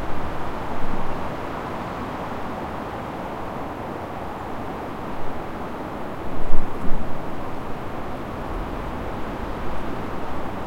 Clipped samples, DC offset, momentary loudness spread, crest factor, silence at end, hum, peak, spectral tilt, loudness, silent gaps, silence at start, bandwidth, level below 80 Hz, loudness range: under 0.1%; under 0.1%; 2 LU; 20 dB; 0 s; none; 0 dBFS; -7 dB/octave; -31 LUFS; none; 0 s; 5.4 kHz; -30 dBFS; 1 LU